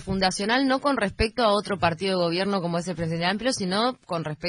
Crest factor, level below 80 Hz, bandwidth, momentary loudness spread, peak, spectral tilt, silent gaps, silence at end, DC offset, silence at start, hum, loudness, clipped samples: 16 dB; -44 dBFS; 10.5 kHz; 6 LU; -8 dBFS; -4.5 dB/octave; none; 0 s; under 0.1%; 0 s; none; -24 LUFS; under 0.1%